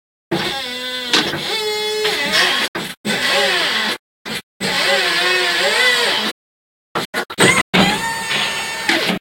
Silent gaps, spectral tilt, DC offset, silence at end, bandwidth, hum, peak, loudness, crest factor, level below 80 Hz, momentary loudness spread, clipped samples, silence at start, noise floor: 2.68-2.74 s, 2.97-3.04 s, 3.99-4.25 s, 4.43-4.60 s, 6.32-6.95 s, 7.05-7.13 s, 7.61-7.73 s; -2 dB/octave; under 0.1%; 0 s; 17 kHz; none; 0 dBFS; -16 LUFS; 18 dB; -52 dBFS; 10 LU; under 0.1%; 0.3 s; under -90 dBFS